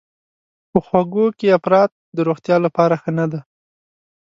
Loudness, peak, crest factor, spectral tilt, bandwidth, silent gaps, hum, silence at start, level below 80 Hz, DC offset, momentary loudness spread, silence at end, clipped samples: -17 LUFS; 0 dBFS; 18 dB; -8.5 dB/octave; 7.6 kHz; 1.92-2.13 s; none; 0.75 s; -56 dBFS; under 0.1%; 7 LU; 0.8 s; under 0.1%